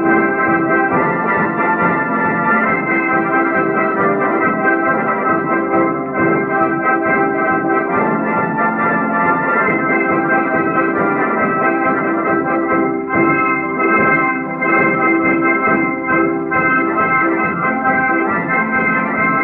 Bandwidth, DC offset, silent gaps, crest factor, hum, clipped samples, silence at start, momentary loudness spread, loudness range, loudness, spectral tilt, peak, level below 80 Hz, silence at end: 4.1 kHz; under 0.1%; none; 12 dB; none; under 0.1%; 0 s; 3 LU; 1 LU; -14 LUFS; -11 dB/octave; -2 dBFS; -56 dBFS; 0 s